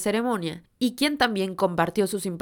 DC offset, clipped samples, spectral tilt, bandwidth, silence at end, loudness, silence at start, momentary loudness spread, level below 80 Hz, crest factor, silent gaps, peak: under 0.1%; under 0.1%; -4.5 dB/octave; 19.5 kHz; 0 s; -25 LUFS; 0 s; 6 LU; -58 dBFS; 20 dB; none; -6 dBFS